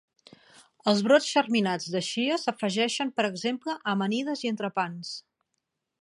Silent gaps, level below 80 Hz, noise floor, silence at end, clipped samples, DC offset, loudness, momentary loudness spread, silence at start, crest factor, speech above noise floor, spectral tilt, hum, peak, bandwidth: none; -80 dBFS; -81 dBFS; 0.8 s; under 0.1%; under 0.1%; -27 LUFS; 10 LU; 0.85 s; 20 dB; 55 dB; -4 dB/octave; none; -8 dBFS; 11.5 kHz